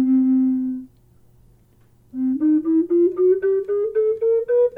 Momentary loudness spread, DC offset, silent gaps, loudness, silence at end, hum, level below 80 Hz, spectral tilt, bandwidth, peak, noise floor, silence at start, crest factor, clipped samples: 9 LU; under 0.1%; none; -19 LUFS; 0 s; none; -60 dBFS; -10 dB/octave; 2.6 kHz; -10 dBFS; -54 dBFS; 0 s; 10 dB; under 0.1%